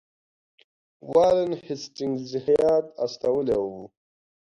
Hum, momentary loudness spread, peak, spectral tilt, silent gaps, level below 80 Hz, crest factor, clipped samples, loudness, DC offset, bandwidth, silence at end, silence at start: none; 12 LU; -6 dBFS; -6 dB/octave; none; -58 dBFS; 18 dB; under 0.1%; -24 LUFS; under 0.1%; 10.5 kHz; 0.65 s; 1.05 s